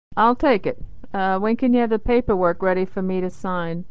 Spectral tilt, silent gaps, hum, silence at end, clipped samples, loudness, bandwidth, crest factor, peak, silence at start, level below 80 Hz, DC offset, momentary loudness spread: -8 dB/octave; none; none; 0 s; under 0.1%; -21 LUFS; 7.8 kHz; 16 dB; -4 dBFS; 0.15 s; -40 dBFS; 3%; 8 LU